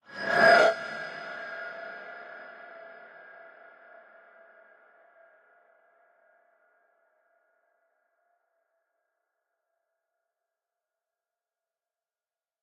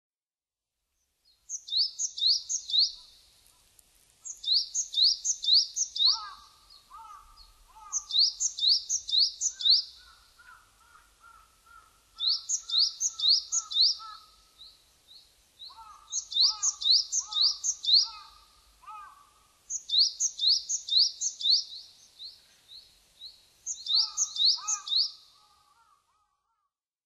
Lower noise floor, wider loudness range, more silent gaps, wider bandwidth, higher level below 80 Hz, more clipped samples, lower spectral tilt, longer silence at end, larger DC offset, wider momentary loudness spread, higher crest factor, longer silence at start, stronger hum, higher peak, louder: about the same, under -90 dBFS vs under -90 dBFS; first, 28 LU vs 4 LU; neither; about the same, 12 kHz vs 13 kHz; second, -78 dBFS vs -70 dBFS; neither; first, -3.5 dB/octave vs 5 dB/octave; first, 9.7 s vs 1.9 s; neither; first, 30 LU vs 22 LU; about the same, 24 dB vs 20 dB; second, 0.1 s vs 1.5 s; neither; first, -8 dBFS vs -12 dBFS; about the same, -25 LUFS vs -25 LUFS